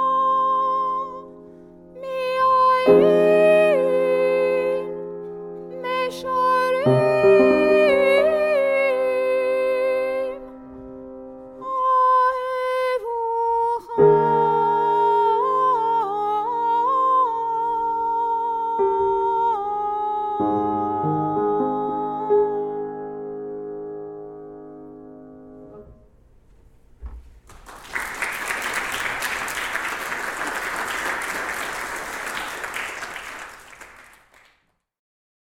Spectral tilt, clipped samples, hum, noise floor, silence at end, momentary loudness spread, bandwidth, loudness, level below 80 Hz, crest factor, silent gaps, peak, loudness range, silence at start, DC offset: -5 dB/octave; under 0.1%; none; -66 dBFS; 1.55 s; 19 LU; 16.5 kHz; -20 LUFS; -54 dBFS; 18 dB; none; -4 dBFS; 14 LU; 0 s; under 0.1%